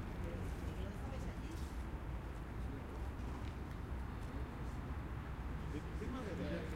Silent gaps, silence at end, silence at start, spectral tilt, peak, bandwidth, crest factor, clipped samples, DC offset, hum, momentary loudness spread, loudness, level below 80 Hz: none; 0 s; 0 s; -7 dB/octave; -30 dBFS; 16 kHz; 14 dB; under 0.1%; under 0.1%; none; 3 LU; -46 LUFS; -46 dBFS